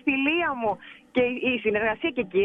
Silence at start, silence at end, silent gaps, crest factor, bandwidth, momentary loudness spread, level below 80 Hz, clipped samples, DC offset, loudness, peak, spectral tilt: 0.05 s; 0 s; none; 14 dB; 4 kHz; 7 LU; -58 dBFS; under 0.1%; under 0.1%; -25 LUFS; -10 dBFS; -7 dB/octave